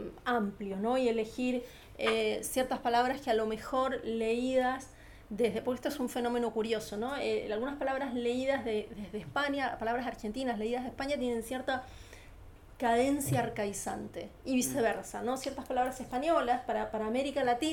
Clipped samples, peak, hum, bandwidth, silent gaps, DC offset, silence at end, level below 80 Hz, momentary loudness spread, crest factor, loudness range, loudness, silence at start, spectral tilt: under 0.1%; -16 dBFS; none; 18.5 kHz; none; under 0.1%; 0 s; -56 dBFS; 8 LU; 16 dB; 3 LU; -33 LUFS; 0 s; -4.5 dB/octave